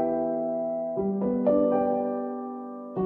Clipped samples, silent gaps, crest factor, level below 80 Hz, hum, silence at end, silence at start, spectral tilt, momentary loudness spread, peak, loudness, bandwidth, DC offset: under 0.1%; none; 16 dB; -60 dBFS; none; 0 s; 0 s; -12 dB/octave; 12 LU; -12 dBFS; -27 LUFS; 3.2 kHz; under 0.1%